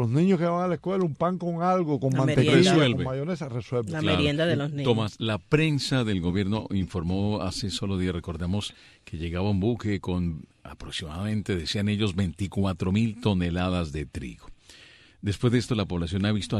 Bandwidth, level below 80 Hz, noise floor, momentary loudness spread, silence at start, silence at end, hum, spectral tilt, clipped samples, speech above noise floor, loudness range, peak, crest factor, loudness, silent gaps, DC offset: 12 kHz; -48 dBFS; -53 dBFS; 10 LU; 0 s; 0 s; none; -6.5 dB/octave; under 0.1%; 27 dB; 6 LU; -6 dBFS; 20 dB; -26 LUFS; none; under 0.1%